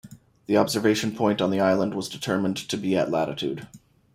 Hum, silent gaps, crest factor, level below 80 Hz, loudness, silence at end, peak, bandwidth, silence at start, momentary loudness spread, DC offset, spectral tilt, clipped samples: none; none; 20 dB; -62 dBFS; -24 LUFS; 0.4 s; -4 dBFS; 16 kHz; 0.05 s; 9 LU; under 0.1%; -5 dB/octave; under 0.1%